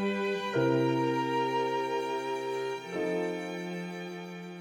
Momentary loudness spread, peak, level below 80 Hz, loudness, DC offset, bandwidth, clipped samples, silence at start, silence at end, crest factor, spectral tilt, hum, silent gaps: 11 LU; -14 dBFS; -74 dBFS; -31 LUFS; under 0.1%; 17 kHz; under 0.1%; 0 s; 0 s; 16 dB; -6 dB/octave; none; none